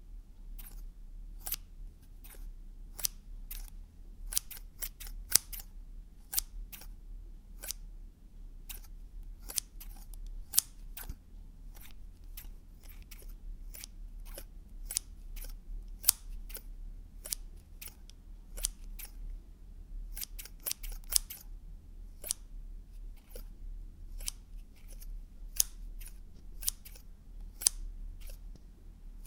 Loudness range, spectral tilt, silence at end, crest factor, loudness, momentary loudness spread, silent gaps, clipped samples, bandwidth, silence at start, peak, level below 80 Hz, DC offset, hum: 9 LU; -0.5 dB/octave; 0 s; 42 dB; -36 LUFS; 24 LU; none; under 0.1%; 18 kHz; 0 s; 0 dBFS; -46 dBFS; under 0.1%; none